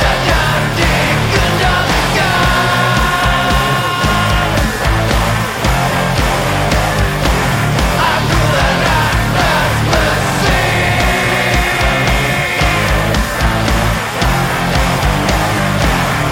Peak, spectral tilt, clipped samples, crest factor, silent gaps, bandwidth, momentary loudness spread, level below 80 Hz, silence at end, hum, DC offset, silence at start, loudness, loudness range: 0 dBFS; -4.5 dB/octave; under 0.1%; 12 dB; none; 17 kHz; 2 LU; -20 dBFS; 0 s; none; under 0.1%; 0 s; -13 LUFS; 2 LU